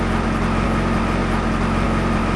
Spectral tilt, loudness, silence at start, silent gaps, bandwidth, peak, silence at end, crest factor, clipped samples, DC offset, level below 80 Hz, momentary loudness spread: -6.5 dB/octave; -20 LUFS; 0 s; none; 11 kHz; -6 dBFS; 0 s; 12 dB; under 0.1%; under 0.1%; -26 dBFS; 1 LU